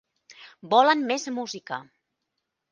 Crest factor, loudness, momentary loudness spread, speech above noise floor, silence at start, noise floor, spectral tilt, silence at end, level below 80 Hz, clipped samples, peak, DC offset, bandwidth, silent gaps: 22 dB; -23 LUFS; 16 LU; 57 dB; 0.3 s; -81 dBFS; -3 dB/octave; 0.9 s; -80 dBFS; under 0.1%; -6 dBFS; under 0.1%; 9.6 kHz; none